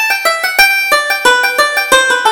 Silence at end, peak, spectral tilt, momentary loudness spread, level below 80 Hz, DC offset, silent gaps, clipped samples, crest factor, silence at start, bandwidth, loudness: 0 s; 0 dBFS; 1 dB/octave; 3 LU; -46 dBFS; under 0.1%; none; 0.2%; 10 dB; 0 s; over 20 kHz; -9 LUFS